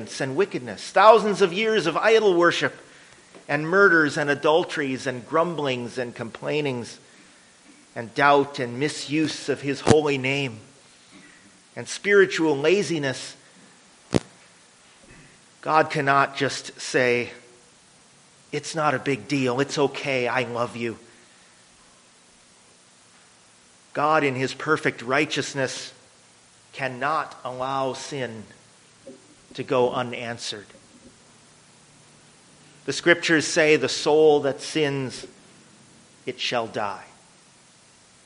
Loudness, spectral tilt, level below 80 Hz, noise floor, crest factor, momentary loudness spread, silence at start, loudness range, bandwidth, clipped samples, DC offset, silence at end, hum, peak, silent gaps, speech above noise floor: -23 LUFS; -4.5 dB/octave; -62 dBFS; -55 dBFS; 24 dB; 16 LU; 0 s; 10 LU; 10.5 kHz; under 0.1%; under 0.1%; 1.2 s; none; -2 dBFS; none; 32 dB